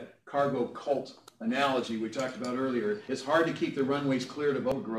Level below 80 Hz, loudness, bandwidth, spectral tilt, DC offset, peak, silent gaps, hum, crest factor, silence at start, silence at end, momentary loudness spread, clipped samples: -70 dBFS; -31 LUFS; 14 kHz; -5.5 dB/octave; under 0.1%; -14 dBFS; none; none; 16 dB; 0 s; 0 s; 7 LU; under 0.1%